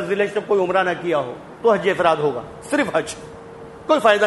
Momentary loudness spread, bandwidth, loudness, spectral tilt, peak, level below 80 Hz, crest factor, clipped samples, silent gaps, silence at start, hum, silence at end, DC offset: 17 LU; 11.5 kHz; -20 LUFS; -4.5 dB/octave; -2 dBFS; -56 dBFS; 18 dB; under 0.1%; none; 0 s; none; 0 s; under 0.1%